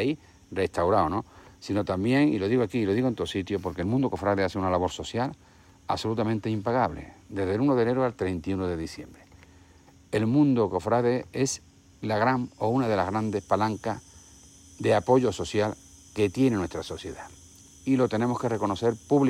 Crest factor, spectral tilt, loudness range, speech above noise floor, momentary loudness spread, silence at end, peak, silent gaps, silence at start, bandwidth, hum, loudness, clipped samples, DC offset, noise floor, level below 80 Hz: 18 dB; -6.5 dB/octave; 2 LU; 29 dB; 13 LU; 0 s; -8 dBFS; none; 0 s; 13.5 kHz; none; -27 LUFS; under 0.1%; under 0.1%; -55 dBFS; -54 dBFS